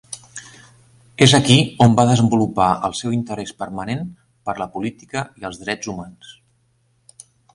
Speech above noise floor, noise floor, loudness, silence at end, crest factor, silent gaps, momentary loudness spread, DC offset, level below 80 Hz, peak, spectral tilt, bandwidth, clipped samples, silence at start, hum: 44 dB; -62 dBFS; -18 LUFS; 1.25 s; 20 dB; none; 20 LU; under 0.1%; -50 dBFS; 0 dBFS; -5 dB/octave; 11.5 kHz; under 0.1%; 0.1 s; none